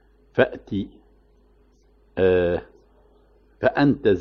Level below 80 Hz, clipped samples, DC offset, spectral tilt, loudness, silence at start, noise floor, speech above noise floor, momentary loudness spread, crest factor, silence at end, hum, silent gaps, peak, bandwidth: -50 dBFS; under 0.1%; under 0.1%; -9 dB/octave; -22 LUFS; 0.35 s; -58 dBFS; 37 dB; 11 LU; 18 dB; 0 s; none; none; -6 dBFS; 6 kHz